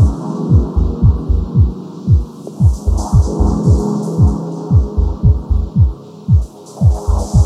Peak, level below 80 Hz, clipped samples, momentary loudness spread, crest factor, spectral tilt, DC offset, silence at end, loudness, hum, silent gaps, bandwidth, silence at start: 0 dBFS; -18 dBFS; under 0.1%; 5 LU; 12 dB; -9 dB/octave; under 0.1%; 0 s; -15 LUFS; none; none; 10.5 kHz; 0 s